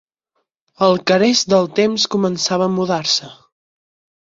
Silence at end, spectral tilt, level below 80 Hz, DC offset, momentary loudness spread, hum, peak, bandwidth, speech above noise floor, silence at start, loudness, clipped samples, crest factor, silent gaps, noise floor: 0.9 s; -4 dB/octave; -60 dBFS; under 0.1%; 4 LU; none; -2 dBFS; 7.8 kHz; 56 dB; 0.8 s; -16 LUFS; under 0.1%; 16 dB; none; -72 dBFS